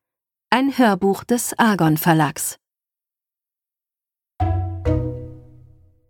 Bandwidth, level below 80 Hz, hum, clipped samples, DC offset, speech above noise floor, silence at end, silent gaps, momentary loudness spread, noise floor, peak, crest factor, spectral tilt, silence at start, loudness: 19 kHz; -38 dBFS; none; under 0.1%; under 0.1%; 72 dB; 0.7 s; none; 12 LU; -89 dBFS; -2 dBFS; 20 dB; -5 dB/octave; 0.5 s; -19 LUFS